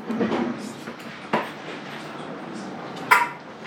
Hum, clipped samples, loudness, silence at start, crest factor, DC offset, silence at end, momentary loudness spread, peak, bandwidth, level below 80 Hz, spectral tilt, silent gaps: none; under 0.1%; -26 LUFS; 0 s; 26 dB; under 0.1%; 0 s; 16 LU; -2 dBFS; 19.5 kHz; -72 dBFS; -4.5 dB/octave; none